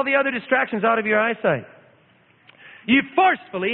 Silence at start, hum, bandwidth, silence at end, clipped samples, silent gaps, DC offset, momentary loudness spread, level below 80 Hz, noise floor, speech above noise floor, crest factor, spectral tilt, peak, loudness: 0 s; none; 4.3 kHz; 0 s; under 0.1%; none; under 0.1%; 5 LU; -66 dBFS; -57 dBFS; 37 dB; 18 dB; -10 dB/octave; -4 dBFS; -20 LUFS